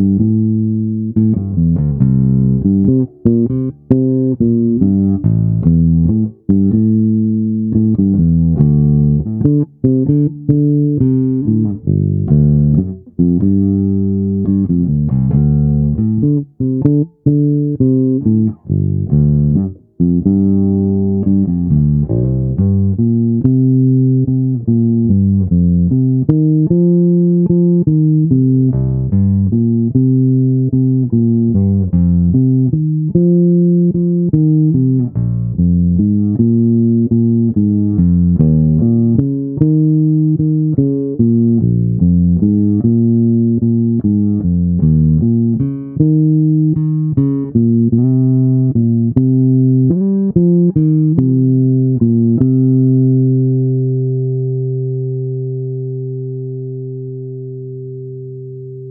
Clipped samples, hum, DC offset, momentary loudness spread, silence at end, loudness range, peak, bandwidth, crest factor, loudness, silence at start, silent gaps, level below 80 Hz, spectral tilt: under 0.1%; 50 Hz at -45 dBFS; under 0.1%; 6 LU; 0 s; 2 LU; 0 dBFS; 1.4 kHz; 12 dB; -13 LUFS; 0 s; none; -32 dBFS; -16.5 dB/octave